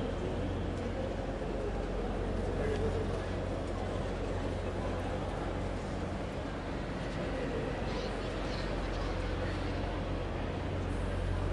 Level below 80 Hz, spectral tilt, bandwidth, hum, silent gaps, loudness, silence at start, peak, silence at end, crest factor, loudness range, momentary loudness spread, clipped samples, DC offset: -40 dBFS; -6.5 dB/octave; 11 kHz; none; none; -36 LUFS; 0 s; -20 dBFS; 0 s; 14 dB; 1 LU; 3 LU; under 0.1%; under 0.1%